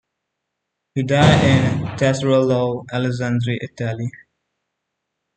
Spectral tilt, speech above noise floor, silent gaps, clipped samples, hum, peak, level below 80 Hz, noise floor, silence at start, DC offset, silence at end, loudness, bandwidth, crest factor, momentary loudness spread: -6.5 dB/octave; 61 dB; none; under 0.1%; none; -2 dBFS; -46 dBFS; -78 dBFS; 0.95 s; under 0.1%; 1.2 s; -18 LUFS; 9.2 kHz; 18 dB; 12 LU